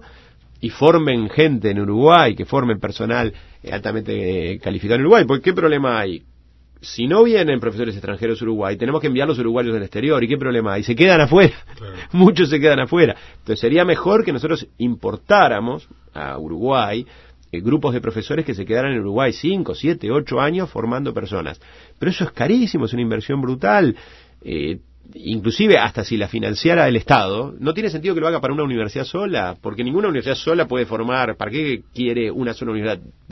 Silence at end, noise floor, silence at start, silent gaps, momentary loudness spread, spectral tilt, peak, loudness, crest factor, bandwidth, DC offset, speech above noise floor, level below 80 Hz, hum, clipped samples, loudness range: 0.2 s; -49 dBFS; 0.65 s; none; 13 LU; -7 dB/octave; 0 dBFS; -18 LUFS; 18 dB; 6.2 kHz; under 0.1%; 31 dB; -46 dBFS; none; under 0.1%; 6 LU